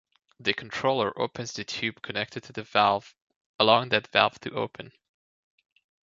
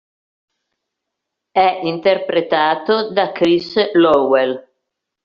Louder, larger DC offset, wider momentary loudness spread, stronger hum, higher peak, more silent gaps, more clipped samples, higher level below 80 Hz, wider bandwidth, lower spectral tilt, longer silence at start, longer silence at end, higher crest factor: second, -26 LUFS vs -16 LUFS; neither; first, 12 LU vs 6 LU; neither; about the same, -2 dBFS vs -2 dBFS; first, 3.22-3.27 s, 3.36-3.59 s vs none; neither; second, -66 dBFS vs -58 dBFS; first, 7.8 kHz vs 7 kHz; first, -4 dB/octave vs -2.5 dB/octave; second, 0.4 s vs 1.55 s; first, 1.15 s vs 0.65 s; first, 26 dB vs 16 dB